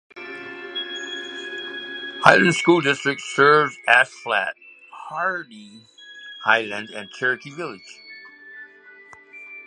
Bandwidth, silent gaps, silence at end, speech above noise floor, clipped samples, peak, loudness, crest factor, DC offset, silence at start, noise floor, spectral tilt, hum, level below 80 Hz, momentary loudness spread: 10.5 kHz; none; 0.05 s; 27 dB; under 0.1%; 0 dBFS; -20 LUFS; 22 dB; under 0.1%; 0.15 s; -47 dBFS; -4 dB/octave; none; -68 dBFS; 25 LU